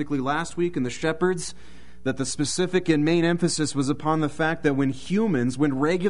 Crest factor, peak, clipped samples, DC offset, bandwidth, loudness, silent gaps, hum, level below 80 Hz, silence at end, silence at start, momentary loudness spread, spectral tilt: 16 dB; -8 dBFS; under 0.1%; 2%; 11 kHz; -24 LUFS; none; none; -52 dBFS; 0 s; 0 s; 6 LU; -5 dB/octave